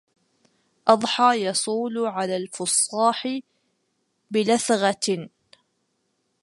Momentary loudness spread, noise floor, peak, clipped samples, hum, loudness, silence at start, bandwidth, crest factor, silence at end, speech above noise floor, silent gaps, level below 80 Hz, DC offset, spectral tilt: 9 LU; -73 dBFS; -2 dBFS; under 0.1%; none; -22 LUFS; 0.85 s; 11.5 kHz; 22 dB; 1.15 s; 50 dB; none; -76 dBFS; under 0.1%; -3 dB/octave